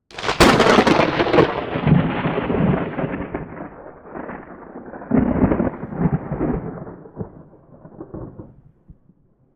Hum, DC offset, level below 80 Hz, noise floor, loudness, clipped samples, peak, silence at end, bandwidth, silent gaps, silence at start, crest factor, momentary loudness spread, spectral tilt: none; under 0.1%; -38 dBFS; -56 dBFS; -18 LUFS; under 0.1%; -2 dBFS; 1.1 s; 17.5 kHz; none; 0.1 s; 18 dB; 22 LU; -6 dB/octave